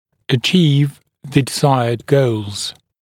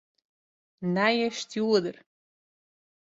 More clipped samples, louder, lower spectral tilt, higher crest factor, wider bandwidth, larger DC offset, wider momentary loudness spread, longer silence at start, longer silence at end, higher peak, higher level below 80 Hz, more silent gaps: neither; first, -16 LUFS vs -26 LUFS; about the same, -5.5 dB/octave vs -5 dB/octave; about the same, 16 dB vs 20 dB; first, 16 kHz vs 8 kHz; neither; about the same, 10 LU vs 10 LU; second, 0.3 s vs 0.8 s; second, 0.3 s vs 1.15 s; first, 0 dBFS vs -10 dBFS; first, -56 dBFS vs -74 dBFS; neither